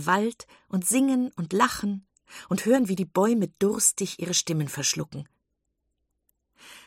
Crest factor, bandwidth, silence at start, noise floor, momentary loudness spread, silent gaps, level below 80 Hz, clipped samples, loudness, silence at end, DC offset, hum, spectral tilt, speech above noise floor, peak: 20 dB; 16.5 kHz; 0 s; -78 dBFS; 10 LU; none; -64 dBFS; under 0.1%; -25 LUFS; 0.1 s; under 0.1%; none; -4 dB/octave; 53 dB; -8 dBFS